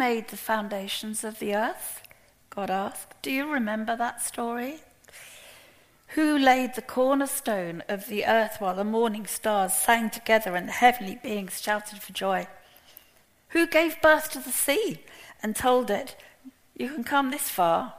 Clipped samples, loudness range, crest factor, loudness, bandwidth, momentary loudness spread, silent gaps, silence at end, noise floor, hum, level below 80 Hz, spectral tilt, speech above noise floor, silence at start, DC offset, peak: under 0.1%; 6 LU; 22 dB; -26 LUFS; 15.5 kHz; 14 LU; none; 0 s; -60 dBFS; none; -62 dBFS; -3 dB/octave; 34 dB; 0 s; under 0.1%; -6 dBFS